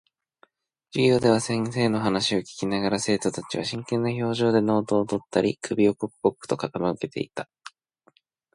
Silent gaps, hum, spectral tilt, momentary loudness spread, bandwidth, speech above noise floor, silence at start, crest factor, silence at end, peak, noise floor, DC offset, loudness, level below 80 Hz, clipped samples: none; none; -5.5 dB/octave; 9 LU; 11.5 kHz; 40 dB; 0.95 s; 20 dB; 1.1 s; -6 dBFS; -64 dBFS; under 0.1%; -25 LUFS; -60 dBFS; under 0.1%